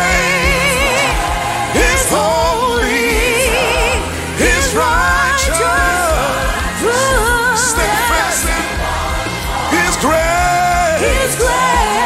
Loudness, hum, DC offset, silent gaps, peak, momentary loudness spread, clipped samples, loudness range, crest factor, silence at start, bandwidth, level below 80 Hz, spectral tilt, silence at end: -13 LUFS; none; under 0.1%; none; 0 dBFS; 5 LU; under 0.1%; 1 LU; 14 dB; 0 s; 16 kHz; -24 dBFS; -3 dB/octave; 0 s